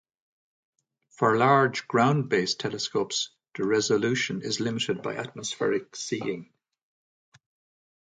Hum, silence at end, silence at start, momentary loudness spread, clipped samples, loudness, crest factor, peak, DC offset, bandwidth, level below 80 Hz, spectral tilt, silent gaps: none; 1.55 s; 1.2 s; 11 LU; under 0.1%; -26 LUFS; 20 dB; -8 dBFS; under 0.1%; 9.6 kHz; -70 dBFS; -4.5 dB/octave; none